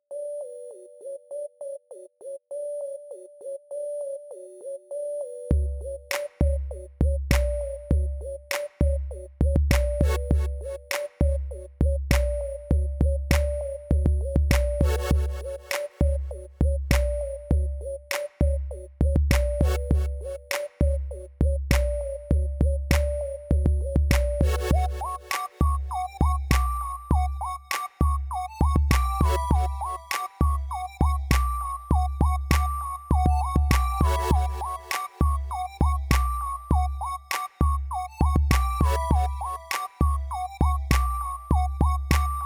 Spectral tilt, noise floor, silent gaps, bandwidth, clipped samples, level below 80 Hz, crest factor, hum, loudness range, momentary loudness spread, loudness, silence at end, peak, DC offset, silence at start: -6 dB/octave; -45 dBFS; none; 16 kHz; under 0.1%; -26 dBFS; 20 dB; none; 5 LU; 12 LU; -26 LUFS; 0 s; -4 dBFS; under 0.1%; 0.1 s